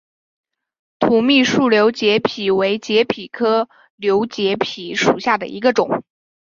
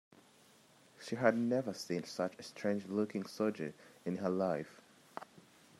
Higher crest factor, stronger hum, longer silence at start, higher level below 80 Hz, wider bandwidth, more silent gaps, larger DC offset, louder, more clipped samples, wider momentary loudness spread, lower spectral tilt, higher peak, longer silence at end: second, 16 dB vs 26 dB; neither; about the same, 1 s vs 1 s; first, -58 dBFS vs -84 dBFS; second, 7.4 kHz vs 13.5 kHz; first, 3.90-3.98 s vs none; neither; first, -17 LUFS vs -37 LUFS; neither; second, 8 LU vs 18 LU; second, -4.5 dB/octave vs -6 dB/octave; first, -2 dBFS vs -14 dBFS; about the same, 0.45 s vs 0.4 s